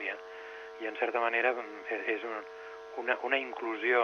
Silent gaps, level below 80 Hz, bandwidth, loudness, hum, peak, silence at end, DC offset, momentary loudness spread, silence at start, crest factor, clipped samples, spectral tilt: none; -78 dBFS; 6.8 kHz; -33 LUFS; none; -12 dBFS; 0 s; under 0.1%; 16 LU; 0 s; 22 dB; under 0.1%; -3 dB/octave